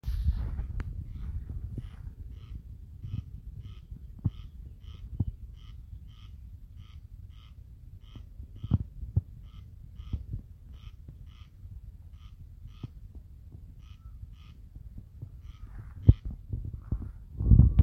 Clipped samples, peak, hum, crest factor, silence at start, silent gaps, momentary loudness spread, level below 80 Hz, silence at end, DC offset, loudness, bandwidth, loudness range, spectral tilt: under 0.1%; -4 dBFS; none; 28 dB; 0.05 s; none; 18 LU; -36 dBFS; 0 s; under 0.1%; -33 LUFS; 4.8 kHz; 16 LU; -10 dB/octave